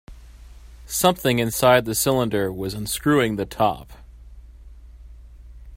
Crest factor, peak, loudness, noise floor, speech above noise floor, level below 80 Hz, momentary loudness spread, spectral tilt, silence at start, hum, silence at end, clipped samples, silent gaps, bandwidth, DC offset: 22 dB; 0 dBFS; -21 LUFS; -43 dBFS; 22 dB; -44 dBFS; 10 LU; -4.5 dB/octave; 0.1 s; none; 0 s; under 0.1%; none; 16.5 kHz; under 0.1%